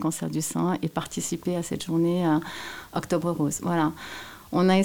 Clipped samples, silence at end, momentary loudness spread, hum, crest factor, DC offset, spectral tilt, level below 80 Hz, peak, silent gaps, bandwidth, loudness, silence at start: under 0.1%; 0 s; 11 LU; none; 16 dB; 0.2%; -5.5 dB/octave; -58 dBFS; -10 dBFS; none; 18 kHz; -27 LUFS; 0 s